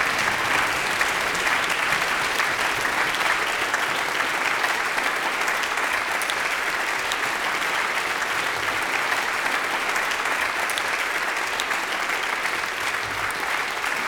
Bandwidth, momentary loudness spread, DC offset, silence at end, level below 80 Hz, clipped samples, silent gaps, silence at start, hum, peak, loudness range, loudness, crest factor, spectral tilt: over 20 kHz; 3 LU; under 0.1%; 0 s; -54 dBFS; under 0.1%; none; 0 s; none; -4 dBFS; 2 LU; -22 LUFS; 20 dB; -1 dB/octave